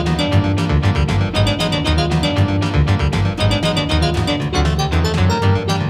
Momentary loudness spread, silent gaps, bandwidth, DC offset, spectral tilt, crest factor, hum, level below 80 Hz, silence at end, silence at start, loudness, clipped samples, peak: 1 LU; none; 13 kHz; under 0.1%; -6 dB/octave; 14 dB; none; -26 dBFS; 0 s; 0 s; -17 LUFS; under 0.1%; -2 dBFS